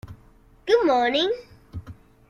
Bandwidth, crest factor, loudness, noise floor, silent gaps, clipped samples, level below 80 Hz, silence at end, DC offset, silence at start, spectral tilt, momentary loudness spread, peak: 10.5 kHz; 18 dB; -22 LUFS; -53 dBFS; none; under 0.1%; -52 dBFS; 0.35 s; under 0.1%; 0.05 s; -5 dB/octave; 21 LU; -6 dBFS